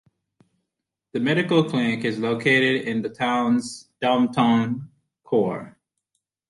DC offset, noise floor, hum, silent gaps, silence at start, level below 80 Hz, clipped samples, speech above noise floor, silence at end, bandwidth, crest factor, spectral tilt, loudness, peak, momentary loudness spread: under 0.1%; -83 dBFS; none; none; 1.15 s; -64 dBFS; under 0.1%; 62 dB; 0.8 s; 11.5 kHz; 18 dB; -6 dB/octave; -22 LUFS; -6 dBFS; 9 LU